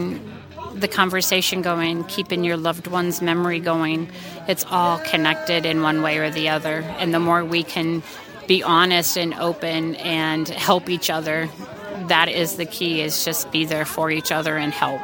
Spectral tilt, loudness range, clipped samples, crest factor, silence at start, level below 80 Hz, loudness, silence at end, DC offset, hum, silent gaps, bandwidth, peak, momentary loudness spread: -3.5 dB/octave; 2 LU; under 0.1%; 22 dB; 0 s; -60 dBFS; -20 LUFS; 0 s; under 0.1%; none; none; 17 kHz; 0 dBFS; 9 LU